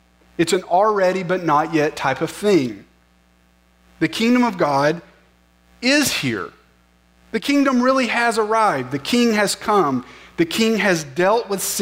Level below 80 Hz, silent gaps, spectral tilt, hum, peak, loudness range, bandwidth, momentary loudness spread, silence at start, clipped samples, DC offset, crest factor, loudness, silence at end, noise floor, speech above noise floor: -56 dBFS; none; -4 dB/octave; 60 Hz at -45 dBFS; -6 dBFS; 3 LU; 16 kHz; 8 LU; 0.4 s; under 0.1%; under 0.1%; 14 dB; -18 LUFS; 0 s; -56 dBFS; 38 dB